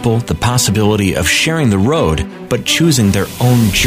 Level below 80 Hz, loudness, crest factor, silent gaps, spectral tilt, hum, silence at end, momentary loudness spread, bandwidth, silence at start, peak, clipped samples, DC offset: -30 dBFS; -13 LUFS; 12 dB; none; -4.5 dB/octave; none; 0 s; 5 LU; 16 kHz; 0 s; 0 dBFS; under 0.1%; under 0.1%